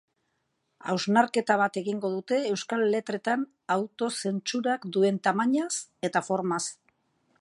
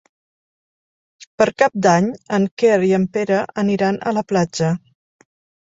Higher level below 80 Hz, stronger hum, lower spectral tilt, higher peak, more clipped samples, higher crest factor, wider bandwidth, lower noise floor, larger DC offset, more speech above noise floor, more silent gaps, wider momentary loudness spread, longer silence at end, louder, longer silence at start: second, -80 dBFS vs -58 dBFS; neither; second, -4.5 dB/octave vs -6 dB/octave; second, -8 dBFS vs -2 dBFS; neither; about the same, 20 dB vs 18 dB; first, 11.5 kHz vs 7.8 kHz; second, -76 dBFS vs under -90 dBFS; neither; second, 49 dB vs over 73 dB; second, none vs 1.27-1.38 s, 2.51-2.57 s; about the same, 7 LU vs 6 LU; second, 0.65 s vs 0.9 s; second, -27 LUFS vs -18 LUFS; second, 0.85 s vs 1.2 s